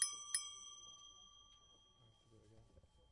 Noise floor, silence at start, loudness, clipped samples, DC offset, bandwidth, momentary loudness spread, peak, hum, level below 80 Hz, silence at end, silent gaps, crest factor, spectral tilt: -70 dBFS; 0 s; -45 LUFS; under 0.1%; under 0.1%; 12 kHz; 26 LU; -20 dBFS; none; -76 dBFS; 0.15 s; none; 30 dB; 1.5 dB/octave